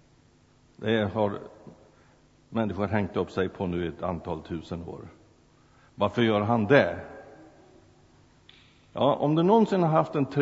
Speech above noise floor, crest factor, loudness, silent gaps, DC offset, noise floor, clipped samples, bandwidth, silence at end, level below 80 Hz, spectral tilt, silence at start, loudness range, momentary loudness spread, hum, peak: 35 dB; 24 dB; -26 LUFS; none; under 0.1%; -60 dBFS; under 0.1%; 8 kHz; 0 s; -58 dBFS; -8 dB/octave; 0.8 s; 5 LU; 18 LU; none; -4 dBFS